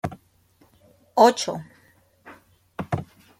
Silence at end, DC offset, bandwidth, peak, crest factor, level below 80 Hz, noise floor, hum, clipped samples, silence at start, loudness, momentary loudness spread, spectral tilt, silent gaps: 0.35 s; under 0.1%; 16 kHz; -2 dBFS; 24 dB; -60 dBFS; -60 dBFS; none; under 0.1%; 0.05 s; -22 LUFS; 19 LU; -4.5 dB/octave; none